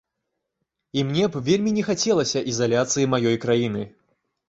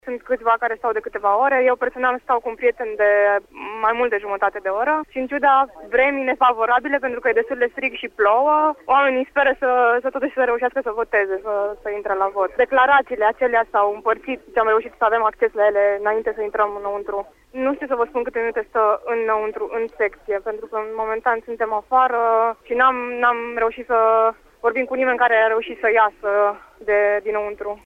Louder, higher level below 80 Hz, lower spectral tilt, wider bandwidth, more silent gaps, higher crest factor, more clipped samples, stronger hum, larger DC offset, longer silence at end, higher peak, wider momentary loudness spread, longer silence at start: second, -22 LUFS vs -19 LUFS; about the same, -58 dBFS vs -54 dBFS; about the same, -4.5 dB/octave vs -5 dB/octave; first, 8 kHz vs 5.8 kHz; neither; about the same, 18 dB vs 16 dB; neither; neither; neither; first, 0.6 s vs 0.1 s; about the same, -6 dBFS vs -4 dBFS; about the same, 7 LU vs 8 LU; first, 0.95 s vs 0.05 s